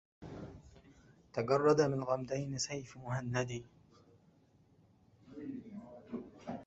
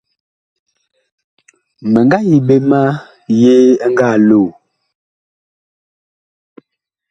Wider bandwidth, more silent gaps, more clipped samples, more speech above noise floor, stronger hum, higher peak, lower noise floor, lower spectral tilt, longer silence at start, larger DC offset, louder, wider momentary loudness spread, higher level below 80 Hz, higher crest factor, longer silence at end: about the same, 8 kHz vs 8 kHz; neither; neither; second, 33 dB vs 62 dB; neither; second, -16 dBFS vs 0 dBFS; about the same, -68 dBFS vs -71 dBFS; second, -5.5 dB/octave vs -8 dB/octave; second, 0.2 s vs 1.8 s; neither; second, -36 LUFS vs -11 LUFS; first, 22 LU vs 9 LU; second, -66 dBFS vs -56 dBFS; first, 22 dB vs 14 dB; second, 0 s vs 2.6 s